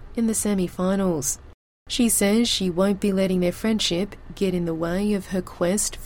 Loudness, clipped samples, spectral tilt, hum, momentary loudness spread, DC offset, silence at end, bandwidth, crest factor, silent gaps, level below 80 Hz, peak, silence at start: -23 LUFS; under 0.1%; -4 dB/octave; none; 8 LU; under 0.1%; 0 s; 17 kHz; 14 dB; 1.54-1.86 s; -42 dBFS; -8 dBFS; 0 s